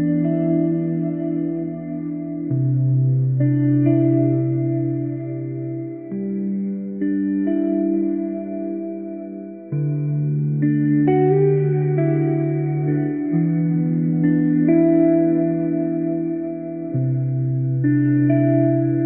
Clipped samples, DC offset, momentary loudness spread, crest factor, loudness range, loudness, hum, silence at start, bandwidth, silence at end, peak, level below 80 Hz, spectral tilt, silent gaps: under 0.1%; 0.1%; 11 LU; 14 dB; 5 LU; -20 LUFS; none; 0 s; 3.1 kHz; 0 s; -6 dBFS; -62 dBFS; -15 dB/octave; none